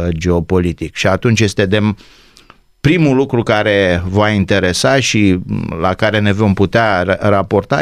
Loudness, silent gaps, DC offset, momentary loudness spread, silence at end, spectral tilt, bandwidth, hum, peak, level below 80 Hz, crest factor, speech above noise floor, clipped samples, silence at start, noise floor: -13 LUFS; none; under 0.1%; 5 LU; 0 s; -5.5 dB/octave; 13.5 kHz; none; -2 dBFS; -36 dBFS; 12 dB; 32 dB; under 0.1%; 0 s; -45 dBFS